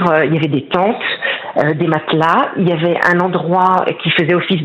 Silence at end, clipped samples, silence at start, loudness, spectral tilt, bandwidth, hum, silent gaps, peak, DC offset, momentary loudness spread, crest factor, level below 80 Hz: 0 s; under 0.1%; 0 s; -14 LUFS; -7.5 dB/octave; 8 kHz; none; none; 0 dBFS; under 0.1%; 4 LU; 14 dB; -56 dBFS